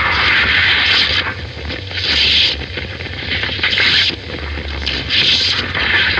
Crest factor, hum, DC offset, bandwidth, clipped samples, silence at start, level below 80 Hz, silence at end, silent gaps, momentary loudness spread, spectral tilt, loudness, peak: 14 dB; none; under 0.1%; 9.2 kHz; under 0.1%; 0 s; -32 dBFS; 0 s; none; 14 LU; -3 dB/octave; -13 LUFS; 0 dBFS